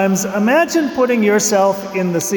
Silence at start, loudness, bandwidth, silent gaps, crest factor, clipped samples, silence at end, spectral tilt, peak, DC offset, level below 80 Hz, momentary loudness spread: 0 s; -15 LUFS; 19.5 kHz; none; 12 dB; under 0.1%; 0 s; -4.5 dB/octave; -4 dBFS; under 0.1%; -56 dBFS; 5 LU